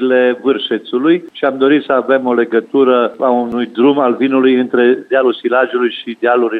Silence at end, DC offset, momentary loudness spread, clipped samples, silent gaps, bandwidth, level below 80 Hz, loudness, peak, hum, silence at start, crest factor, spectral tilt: 0 s; under 0.1%; 5 LU; under 0.1%; none; 4.4 kHz; -64 dBFS; -13 LUFS; 0 dBFS; none; 0 s; 12 dB; -7 dB/octave